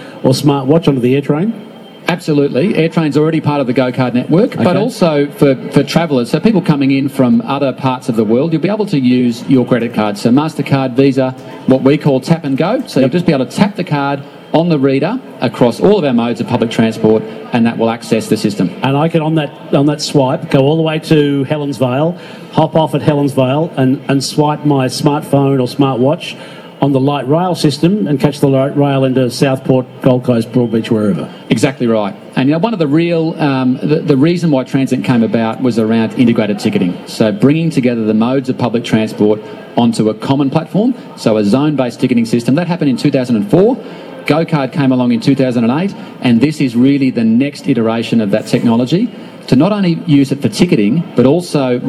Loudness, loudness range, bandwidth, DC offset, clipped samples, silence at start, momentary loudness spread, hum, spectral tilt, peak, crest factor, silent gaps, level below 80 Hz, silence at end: -13 LUFS; 1 LU; 13 kHz; under 0.1%; under 0.1%; 0 s; 5 LU; none; -7 dB/octave; 0 dBFS; 12 dB; none; -50 dBFS; 0 s